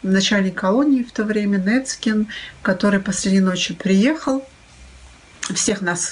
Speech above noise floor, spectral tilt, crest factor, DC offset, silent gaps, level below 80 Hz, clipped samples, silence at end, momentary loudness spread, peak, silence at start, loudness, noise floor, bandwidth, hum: 26 dB; -4.5 dB/octave; 12 dB; under 0.1%; none; -50 dBFS; under 0.1%; 0 s; 7 LU; -8 dBFS; 0.05 s; -19 LUFS; -44 dBFS; 11 kHz; none